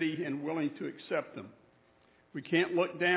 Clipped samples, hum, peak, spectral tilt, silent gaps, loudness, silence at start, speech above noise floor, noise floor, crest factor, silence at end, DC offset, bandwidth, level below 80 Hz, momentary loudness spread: under 0.1%; none; -14 dBFS; -3.5 dB/octave; none; -33 LUFS; 0 s; 33 dB; -66 dBFS; 20 dB; 0 s; under 0.1%; 4 kHz; -80 dBFS; 17 LU